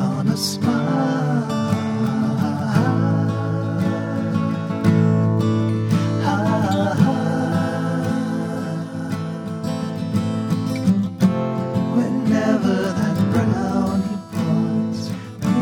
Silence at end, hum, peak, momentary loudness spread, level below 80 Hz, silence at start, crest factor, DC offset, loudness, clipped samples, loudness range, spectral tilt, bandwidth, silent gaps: 0 s; none; -4 dBFS; 7 LU; -52 dBFS; 0 s; 16 dB; under 0.1%; -20 LUFS; under 0.1%; 4 LU; -7 dB/octave; 16 kHz; none